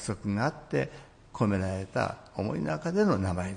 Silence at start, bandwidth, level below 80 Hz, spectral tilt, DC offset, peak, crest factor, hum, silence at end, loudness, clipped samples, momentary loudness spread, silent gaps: 0 s; 10.5 kHz; -58 dBFS; -7 dB/octave; under 0.1%; -12 dBFS; 18 dB; none; 0 s; -30 LUFS; under 0.1%; 7 LU; none